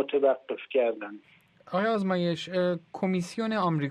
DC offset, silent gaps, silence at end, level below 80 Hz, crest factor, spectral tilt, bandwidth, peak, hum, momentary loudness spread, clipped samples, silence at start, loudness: under 0.1%; none; 0 s; -72 dBFS; 16 dB; -6.5 dB/octave; 11 kHz; -12 dBFS; none; 6 LU; under 0.1%; 0 s; -28 LUFS